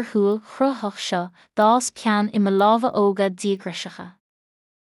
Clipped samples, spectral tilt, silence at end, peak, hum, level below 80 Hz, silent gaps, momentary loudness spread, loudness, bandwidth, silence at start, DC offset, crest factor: under 0.1%; -5 dB/octave; 0.85 s; -6 dBFS; none; -74 dBFS; none; 12 LU; -21 LUFS; 12 kHz; 0 s; under 0.1%; 16 dB